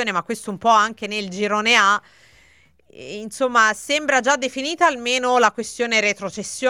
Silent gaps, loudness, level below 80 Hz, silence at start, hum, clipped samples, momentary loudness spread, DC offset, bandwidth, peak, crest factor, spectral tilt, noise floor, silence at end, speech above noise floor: none; -19 LUFS; -64 dBFS; 0 s; none; under 0.1%; 11 LU; under 0.1%; 16 kHz; -2 dBFS; 20 dB; -2 dB/octave; -56 dBFS; 0 s; 36 dB